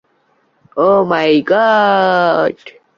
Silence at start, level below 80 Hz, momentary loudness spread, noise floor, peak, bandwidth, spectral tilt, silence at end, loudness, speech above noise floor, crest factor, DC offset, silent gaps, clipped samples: 0.75 s; -58 dBFS; 8 LU; -58 dBFS; -2 dBFS; 7.2 kHz; -6.5 dB/octave; 0.25 s; -12 LUFS; 46 dB; 12 dB; under 0.1%; none; under 0.1%